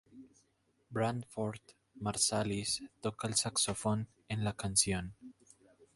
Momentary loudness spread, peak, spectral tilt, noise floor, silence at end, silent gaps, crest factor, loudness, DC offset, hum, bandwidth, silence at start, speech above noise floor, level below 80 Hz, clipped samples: 11 LU; -14 dBFS; -3.5 dB/octave; -75 dBFS; 0.65 s; none; 24 dB; -34 LUFS; under 0.1%; none; 12 kHz; 0.15 s; 39 dB; -60 dBFS; under 0.1%